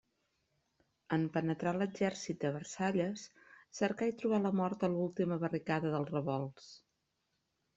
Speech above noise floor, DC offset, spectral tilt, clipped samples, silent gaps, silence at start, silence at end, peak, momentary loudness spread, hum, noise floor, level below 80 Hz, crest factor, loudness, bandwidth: 48 dB; under 0.1%; -6.5 dB/octave; under 0.1%; none; 1.1 s; 1 s; -18 dBFS; 8 LU; none; -83 dBFS; -74 dBFS; 18 dB; -36 LUFS; 8 kHz